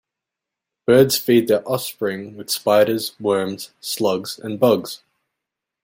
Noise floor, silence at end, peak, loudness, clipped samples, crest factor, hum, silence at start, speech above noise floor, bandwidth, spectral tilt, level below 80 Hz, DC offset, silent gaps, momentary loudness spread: -85 dBFS; 0.9 s; -2 dBFS; -19 LUFS; under 0.1%; 18 dB; none; 0.9 s; 66 dB; 16.5 kHz; -4.5 dB/octave; -62 dBFS; under 0.1%; none; 13 LU